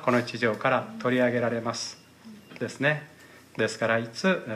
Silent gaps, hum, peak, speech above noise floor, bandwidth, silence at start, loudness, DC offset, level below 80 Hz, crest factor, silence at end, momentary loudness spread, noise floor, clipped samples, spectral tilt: none; none; -10 dBFS; 22 dB; 14.5 kHz; 0 s; -27 LUFS; under 0.1%; -74 dBFS; 18 dB; 0 s; 13 LU; -49 dBFS; under 0.1%; -5 dB/octave